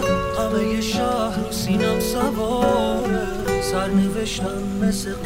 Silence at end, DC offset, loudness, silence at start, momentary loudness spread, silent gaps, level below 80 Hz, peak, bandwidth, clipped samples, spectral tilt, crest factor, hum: 0 s; under 0.1%; -22 LUFS; 0 s; 4 LU; none; -36 dBFS; -6 dBFS; 16 kHz; under 0.1%; -5 dB/octave; 16 dB; none